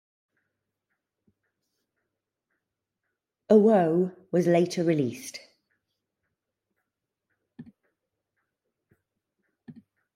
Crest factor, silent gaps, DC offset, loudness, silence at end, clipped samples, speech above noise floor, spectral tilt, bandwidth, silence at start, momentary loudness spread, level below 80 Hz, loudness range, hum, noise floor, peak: 24 dB; none; under 0.1%; -23 LUFS; 0.45 s; under 0.1%; 61 dB; -7 dB/octave; 15.5 kHz; 3.5 s; 19 LU; -78 dBFS; 9 LU; none; -85 dBFS; -6 dBFS